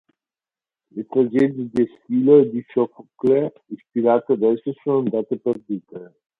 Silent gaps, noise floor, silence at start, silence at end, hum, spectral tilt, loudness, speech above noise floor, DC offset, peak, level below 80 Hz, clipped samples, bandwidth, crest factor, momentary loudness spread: none; under -90 dBFS; 0.95 s; 0.35 s; none; -9.5 dB/octave; -20 LUFS; over 70 dB; under 0.1%; -2 dBFS; -64 dBFS; under 0.1%; 4.1 kHz; 18 dB; 16 LU